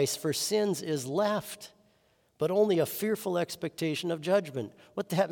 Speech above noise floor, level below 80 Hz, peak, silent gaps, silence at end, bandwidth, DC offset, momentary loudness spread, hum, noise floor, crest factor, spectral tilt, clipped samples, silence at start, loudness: 39 dB; -74 dBFS; -14 dBFS; none; 0 s; 18 kHz; under 0.1%; 12 LU; none; -69 dBFS; 16 dB; -4.5 dB/octave; under 0.1%; 0 s; -30 LUFS